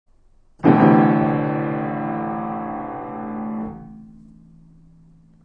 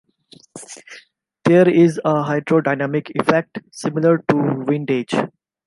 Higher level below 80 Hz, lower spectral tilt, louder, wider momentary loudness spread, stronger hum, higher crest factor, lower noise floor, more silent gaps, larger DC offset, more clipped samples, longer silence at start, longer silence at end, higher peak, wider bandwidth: first, -52 dBFS vs -62 dBFS; first, -11 dB/octave vs -7 dB/octave; about the same, -20 LUFS vs -18 LUFS; second, 17 LU vs 20 LU; neither; about the same, 20 dB vs 16 dB; about the same, -53 dBFS vs -50 dBFS; neither; neither; neither; about the same, 0.6 s vs 0.55 s; first, 1.35 s vs 0.4 s; about the same, -2 dBFS vs -2 dBFS; second, 5 kHz vs 11.5 kHz